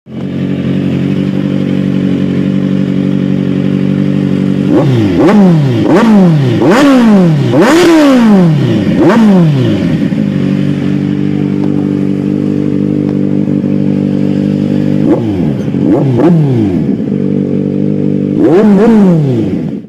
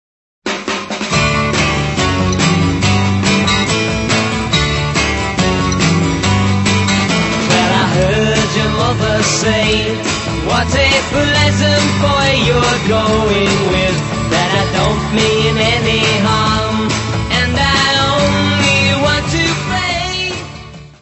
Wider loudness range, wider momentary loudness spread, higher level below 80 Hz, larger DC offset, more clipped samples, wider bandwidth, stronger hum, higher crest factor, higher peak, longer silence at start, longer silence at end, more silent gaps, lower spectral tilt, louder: first, 6 LU vs 1 LU; about the same, 7 LU vs 5 LU; second, -42 dBFS vs -28 dBFS; neither; first, 0.2% vs under 0.1%; first, 13 kHz vs 8.4 kHz; neither; second, 8 dB vs 14 dB; about the same, 0 dBFS vs 0 dBFS; second, 0.05 s vs 0.45 s; about the same, 0 s vs 0.1 s; neither; first, -8 dB/octave vs -4.5 dB/octave; first, -9 LUFS vs -13 LUFS